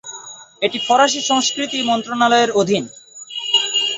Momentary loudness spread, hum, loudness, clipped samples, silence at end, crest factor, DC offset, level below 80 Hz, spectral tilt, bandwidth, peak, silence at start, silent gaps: 18 LU; none; -16 LUFS; under 0.1%; 0 s; 16 dB; under 0.1%; -64 dBFS; -2 dB/octave; 8.4 kHz; -2 dBFS; 0.05 s; none